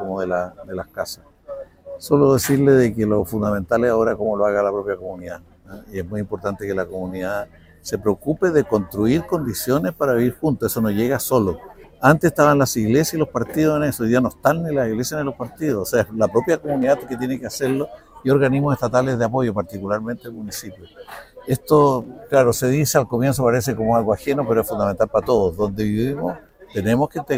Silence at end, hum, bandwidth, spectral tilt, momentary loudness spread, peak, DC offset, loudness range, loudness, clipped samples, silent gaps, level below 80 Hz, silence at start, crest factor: 0 s; none; 16.5 kHz; -6 dB/octave; 15 LU; 0 dBFS; under 0.1%; 5 LU; -20 LUFS; under 0.1%; none; -46 dBFS; 0 s; 20 dB